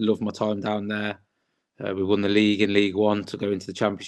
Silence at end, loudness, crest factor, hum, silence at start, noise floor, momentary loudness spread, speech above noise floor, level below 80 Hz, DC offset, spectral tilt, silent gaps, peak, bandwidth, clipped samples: 0 s; -24 LUFS; 18 dB; none; 0 s; -75 dBFS; 11 LU; 52 dB; -68 dBFS; under 0.1%; -6 dB/octave; none; -6 dBFS; 11 kHz; under 0.1%